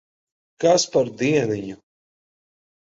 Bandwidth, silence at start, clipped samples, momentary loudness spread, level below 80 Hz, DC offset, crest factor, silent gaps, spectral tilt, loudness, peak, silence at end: 7.8 kHz; 0.6 s; under 0.1%; 10 LU; -62 dBFS; under 0.1%; 18 dB; none; -4.5 dB/octave; -21 LUFS; -6 dBFS; 1.15 s